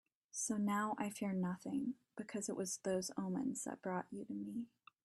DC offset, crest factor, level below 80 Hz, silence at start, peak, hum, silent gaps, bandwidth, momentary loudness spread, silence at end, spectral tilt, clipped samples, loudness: under 0.1%; 16 dB; -80 dBFS; 0.35 s; -26 dBFS; none; none; 13 kHz; 9 LU; 0.4 s; -5 dB/octave; under 0.1%; -42 LUFS